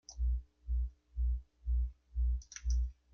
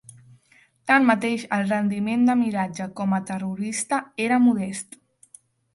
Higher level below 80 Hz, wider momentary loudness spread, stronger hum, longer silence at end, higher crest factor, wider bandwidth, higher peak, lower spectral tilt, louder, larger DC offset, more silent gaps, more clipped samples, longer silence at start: first, -36 dBFS vs -66 dBFS; second, 5 LU vs 11 LU; neither; second, 0.2 s vs 0.9 s; second, 12 dB vs 18 dB; second, 6.8 kHz vs 11.5 kHz; second, -24 dBFS vs -6 dBFS; about the same, -4.5 dB/octave vs -5 dB/octave; second, -39 LUFS vs -23 LUFS; neither; neither; neither; second, 0.1 s vs 0.85 s